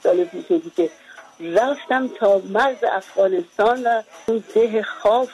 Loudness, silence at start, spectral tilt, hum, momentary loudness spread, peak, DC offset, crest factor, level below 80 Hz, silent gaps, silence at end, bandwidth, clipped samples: -20 LUFS; 0.05 s; -5 dB/octave; none; 6 LU; -6 dBFS; under 0.1%; 14 dB; -62 dBFS; none; 0 s; 12 kHz; under 0.1%